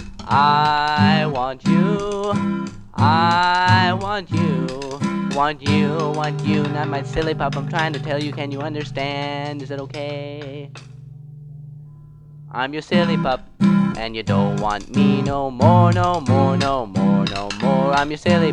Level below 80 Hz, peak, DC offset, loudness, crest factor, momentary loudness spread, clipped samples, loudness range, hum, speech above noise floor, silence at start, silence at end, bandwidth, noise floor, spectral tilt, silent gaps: -44 dBFS; 0 dBFS; under 0.1%; -19 LUFS; 18 dB; 14 LU; under 0.1%; 10 LU; none; 23 dB; 0 s; 0 s; 10 kHz; -41 dBFS; -6.5 dB/octave; none